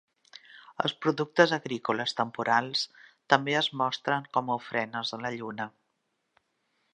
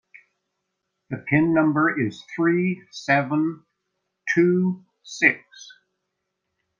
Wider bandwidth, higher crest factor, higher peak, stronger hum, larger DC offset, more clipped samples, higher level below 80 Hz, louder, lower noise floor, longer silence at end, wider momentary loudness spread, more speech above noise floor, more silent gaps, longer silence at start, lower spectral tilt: first, 9.6 kHz vs 7.4 kHz; about the same, 26 dB vs 22 dB; about the same, -4 dBFS vs -2 dBFS; neither; neither; neither; second, -78 dBFS vs -66 dBFS; second, -28 LUFS vs -22 LUFS; about the same, -78 dBFS vs -79 dBFS; about the same, 1.25 s vs 1.15 s; second, 12 LU vs 16 LU; second, 50 dB vs 57 dB; neither; second, 0.5 s vs 1.1 s; second, -4.5 dB/octave vs -6.5 dB/octave